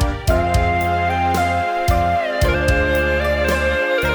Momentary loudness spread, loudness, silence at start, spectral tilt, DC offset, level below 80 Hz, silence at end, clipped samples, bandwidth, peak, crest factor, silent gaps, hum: 2 LU; -18 LUFS; 0 s; -5.5 dB/octave; under 0.1%; -24 dBFS; 0 s; under 0.1%; over 20 kHz; -4 dBFS; 14 dB; none; none